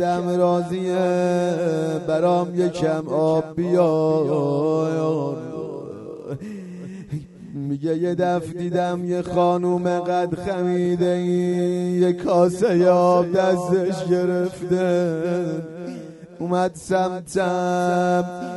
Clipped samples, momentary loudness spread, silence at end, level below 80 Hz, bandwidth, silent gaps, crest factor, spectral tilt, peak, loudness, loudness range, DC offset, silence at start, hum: under 0.1%; 14 LU; 0 s; -58 dBFS; 11.5 kHz; none; 16 dB; -7 dB/octave; -4 dBFS; -21 LUFS; 7 LU; under 0.1%; 0 s; none